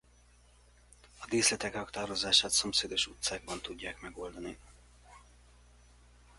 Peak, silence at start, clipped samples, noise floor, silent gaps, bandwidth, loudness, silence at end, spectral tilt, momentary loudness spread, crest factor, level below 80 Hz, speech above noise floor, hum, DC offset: -10 dBFS; 1.15 s; under 0.1%; -62 dBFS; none; 11.5 kHz; -31 LUFS; 1.2 s; -1 dB/octave; 19 LU; 26 dB; -58 dBFS; 29 dB; 60 Hz at -55 dBFS; under 0.1%